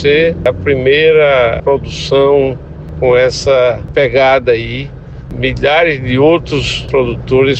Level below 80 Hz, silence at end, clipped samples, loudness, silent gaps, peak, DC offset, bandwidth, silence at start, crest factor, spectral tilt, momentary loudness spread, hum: -30 dBFS; 0 s; under 0.1%; -11 LUFS; none; 0 dBFS; under 0.1%; 8.6 kHz; 0 s; 10 dB; -5.5 dB/octave; 9 LU; none